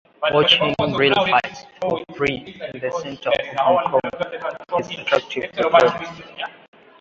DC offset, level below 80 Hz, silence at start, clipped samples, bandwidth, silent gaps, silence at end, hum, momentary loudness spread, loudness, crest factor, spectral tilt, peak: under 0.1%; -54 dBFS; 0.2 s; under 0.1%; 7.8 kHz; none; 0.5 s; none; 16 LU; -19 LUFS; 20 dB; -4.5 dB/octave; 0 dBFS